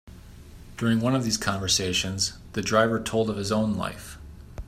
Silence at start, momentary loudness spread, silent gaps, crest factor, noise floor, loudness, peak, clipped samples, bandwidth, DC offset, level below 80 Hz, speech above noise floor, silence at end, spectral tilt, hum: 0.05 s; 18 LU; none; 20 dB; -45 dBFS; -25 LUFS; -6 dBFS; under 0.1%; 15.5 kHz; under 0.1%; -46 dBFS; 20 dB; 0 s; -4 dB/octave; none